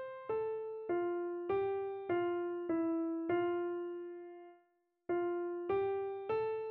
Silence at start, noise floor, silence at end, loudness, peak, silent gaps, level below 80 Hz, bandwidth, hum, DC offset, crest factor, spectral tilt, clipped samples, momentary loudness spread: 0 s; -76 dBFS; 0 s; -37 LUFS; -22 dBFS; none; -74 dBFS; 4.3 kHz; none; under 0.1%; 14 dB; -5.5 dB/octave; under 0.1%; 9 LU